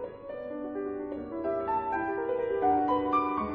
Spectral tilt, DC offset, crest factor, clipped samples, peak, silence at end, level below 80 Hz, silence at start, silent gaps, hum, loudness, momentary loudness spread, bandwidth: -8.5 dB/octave; under 0.1%; 16 dB; under 0.1%; -14 dBFS; 0 s; -58 dBFS; 0 s; none; none; -31 LUFS; 11 LU; 5.2 kHz